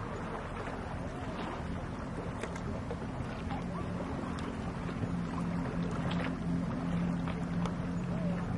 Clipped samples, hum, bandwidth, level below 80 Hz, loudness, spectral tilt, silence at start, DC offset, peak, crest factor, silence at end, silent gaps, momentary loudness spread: under 0.1%; none; 11 kHz; -48 dBFS; -37 LUFS; -7.5 dB/octave; 0 s; under 0.1%; -22 dBFS; 14 dB; 0 s; none; 5 LU